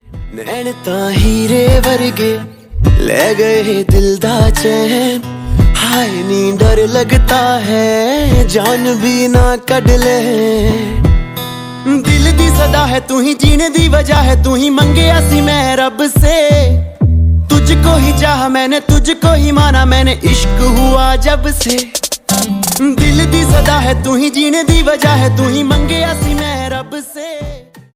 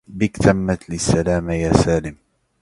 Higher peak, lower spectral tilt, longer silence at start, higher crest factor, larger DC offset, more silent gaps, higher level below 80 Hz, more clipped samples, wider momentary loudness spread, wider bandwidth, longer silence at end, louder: about the same, 0 dBFS vs 0 dBFS; about the same, -5 dB/octave vs -6 dB/octave; about the same, 0.1 s vs 0.1 s; second, 10 dB vs 18 dB; neither; neither; first, -16 dBFS vs -34 dBFS; neither; about the same, 7 LU vs 7 LU; first, 16.5 kHz vs 11.5 kHz; second, 0.15 s vs 0.45 s; first, -11 LUFS vs -19 LUFS